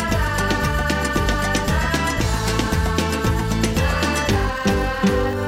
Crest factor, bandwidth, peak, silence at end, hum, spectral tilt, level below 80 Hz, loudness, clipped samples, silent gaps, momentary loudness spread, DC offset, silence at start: 14 dB; 16.5 kHz; -6 dBFS; 0 s; none; -5 dB/octave; -26 dBFS; -20 LUFS; under 0.1%; none; 1 LU; under 0.1%; 0 s